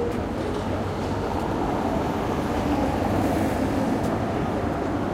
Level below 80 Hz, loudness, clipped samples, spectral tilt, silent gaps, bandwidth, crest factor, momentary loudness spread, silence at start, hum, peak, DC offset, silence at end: -38 dBFS; -25 LUFS; under 0.1%; -7 dB/octave; none; 16.5 kHz; 12 dB; 4 LU; 0 s; none; -12 dBFS; under 0.1%; 0 s